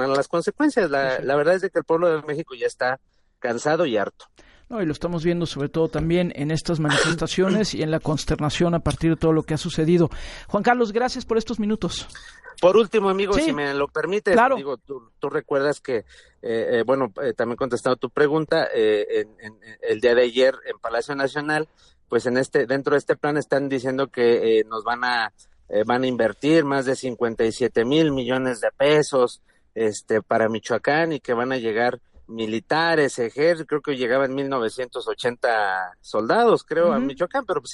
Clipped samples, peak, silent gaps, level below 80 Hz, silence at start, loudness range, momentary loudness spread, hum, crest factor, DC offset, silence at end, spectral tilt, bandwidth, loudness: under 0.1%; -4 dBFS; none; -46 dBFS; 0 s; 3 LU; 9 LU; none; 18 dB; under 0.1%; 0 s; -5.5 dB/octave; 11.5 kHz; -22 LUFS